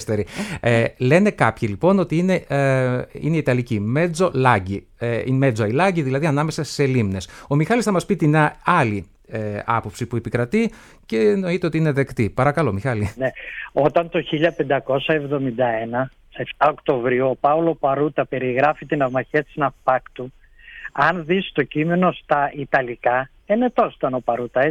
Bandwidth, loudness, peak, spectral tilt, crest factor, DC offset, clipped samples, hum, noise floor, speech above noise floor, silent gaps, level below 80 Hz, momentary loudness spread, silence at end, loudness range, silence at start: 13.5 kHz; -20 LUFS; -2 dBFS; -7 dB/octave; 18 dB; under 0.1%; under 0.1%; none; -39 dBFS; 19 dB; none; -48 dBFS; 8 LU; 0 s; 3 LU; 0 s